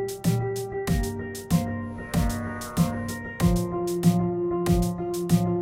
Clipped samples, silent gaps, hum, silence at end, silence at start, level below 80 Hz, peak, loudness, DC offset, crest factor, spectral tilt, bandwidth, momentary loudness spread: under 0.1%; none; none; 0 s; 0 s; -36 dBFS; -8 dBFS; -26 LUFS; under 0.1%; 16 dB; -6.5 dB/octave; 16.5 kHz; 8 LU